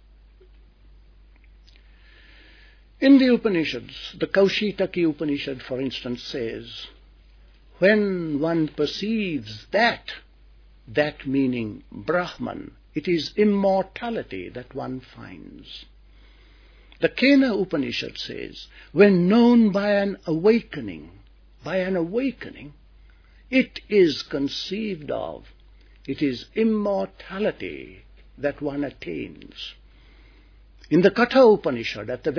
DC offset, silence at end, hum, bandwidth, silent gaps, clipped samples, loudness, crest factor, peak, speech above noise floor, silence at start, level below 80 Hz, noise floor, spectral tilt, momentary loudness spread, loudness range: under 0.1%; 0 s; none; 5.4 kHz; none; under 0.1%; -23 LUFS; 22 dB; -2 dBFS; 29 dB; 3 s; -52 dBFS; -51 dBFS; -6.5 dB/octave; 20 LU; 8 LU